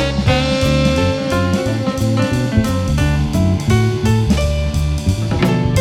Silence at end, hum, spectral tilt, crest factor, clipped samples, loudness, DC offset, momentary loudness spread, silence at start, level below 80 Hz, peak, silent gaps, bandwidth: 0 s; none; -6 dB/octave; 14 dB; under 0.1%; -16 LUFS; under 0.1%; 3 LU; 0 s; -24 dBFS; -2 dBFS; none; 15.5 kHz